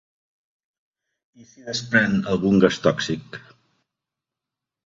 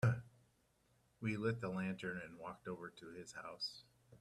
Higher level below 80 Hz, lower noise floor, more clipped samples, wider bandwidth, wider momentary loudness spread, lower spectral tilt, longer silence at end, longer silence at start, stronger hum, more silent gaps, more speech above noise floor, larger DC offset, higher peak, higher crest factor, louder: first, -56 dBFS vs -72 dBFS; first, -87 dBFS vs -76 dBFS; neither; second, 7.8 kHz vs 12 kHz; first, 23 LU vs 12 LU; about the same, -5.5 dB/octave vs -6.5 dB/octave; first, 1.5 s vs 0.05 s; first, 1.65 s vs 0 s; neither; neither; first, 65 dB vs 32 dB; neither; first, -2 dBFS vs -24 dBFS; about the same, 22 dB vs 20 dB; first, -21 LUFS vs -45 LUFS